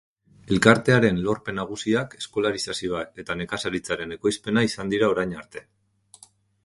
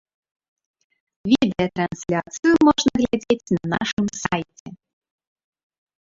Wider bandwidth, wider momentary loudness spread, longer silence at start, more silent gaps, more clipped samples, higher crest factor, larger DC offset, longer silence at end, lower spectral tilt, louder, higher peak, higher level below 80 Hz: first, 11.5 kHz vs 7.8 kHz; first, 13 LU vs 10 LU; second, 0.45 s vs 1.25 s; second, none vs 3.93-3.97 s, 4.60-4.66 s; neither; about the same, 24 dB vs 20 dB; neither; second, 1.05 s vs 1.3 s; about the same, -5 dB/octave vs -5 dB/octave; second, -24 LUFS vs -21 LUFS; first, 0 dBFS vs -4 dBFS; about the same, -52 dBFS vs -52 dBFS